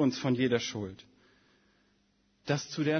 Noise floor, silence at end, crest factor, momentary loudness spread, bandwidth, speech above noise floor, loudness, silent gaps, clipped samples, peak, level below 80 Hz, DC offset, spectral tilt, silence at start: -71 dBFS; 0 s; 18 dB; 17 LU; 6.6 kHz; 41 dB; -32 LUFS; none; under 0.1%; -14 dBFS; -70 dBFS; under 0.1%; -5.5 dB/octave; 0 s